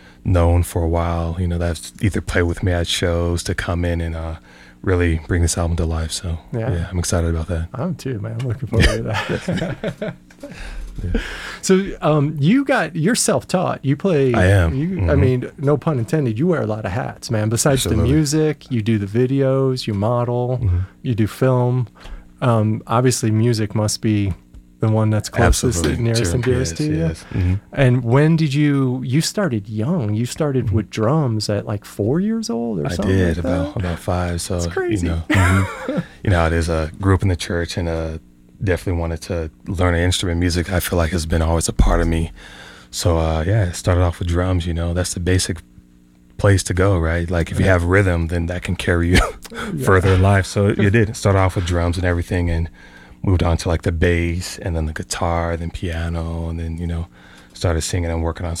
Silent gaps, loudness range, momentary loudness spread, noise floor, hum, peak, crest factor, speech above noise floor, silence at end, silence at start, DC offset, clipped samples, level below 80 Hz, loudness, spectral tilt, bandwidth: none; 4 LU; 9 LU; -49 dBFS; none; -2 dBFS; 16 dB; 31 dB; 0 s; 0.25 s; under 0.1%; under 0.1%; -30 dBFS; -19 LUFS; -5.5 dB/octave; 15.5 kHz